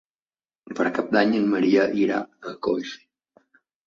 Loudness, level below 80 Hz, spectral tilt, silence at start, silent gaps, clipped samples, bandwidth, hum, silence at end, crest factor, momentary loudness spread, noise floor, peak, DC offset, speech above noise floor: -23 LUFS; -66 dBFS; -6 dB/octave; 0.65 s; none; under 0.1%; 7.4 kHz; none; 0.9 s; 18 dB; 17 LU; under -90 dBFS; -6 dBFS; under 0.1%; over 68 dB